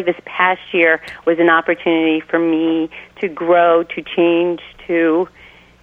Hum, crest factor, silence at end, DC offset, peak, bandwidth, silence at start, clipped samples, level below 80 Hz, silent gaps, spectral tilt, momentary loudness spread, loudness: none; 16 dB; 0.55 s; under 0.1%; 0 dBFS; 4.5 kHz; 0 s; under 0.1%; -56 dBFS; none; -7 dB/octave; 9 LU; -16 LUFS